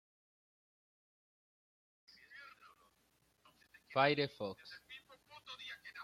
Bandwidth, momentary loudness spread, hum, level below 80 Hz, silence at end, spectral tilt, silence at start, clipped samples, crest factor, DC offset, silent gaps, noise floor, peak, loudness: 16 kHz; 24 LU; none; -82 dBFS; 0 s; -5.5 dB/octave; 2.3 s; under 0.1%; 28 dB; under 0.1%; none; -76 dBFS; -18 dBFS; -38 LUFS